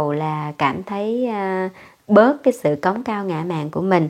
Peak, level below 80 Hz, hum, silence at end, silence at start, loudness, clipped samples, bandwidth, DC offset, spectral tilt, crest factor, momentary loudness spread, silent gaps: 0 dBFS; -62 dBFS; none; 0 s; 0 s; -20 LUFS; under 0.1%; 15 kHz; under 0.1%; -7.5 dB/octave; 20 dB; 10 LU; none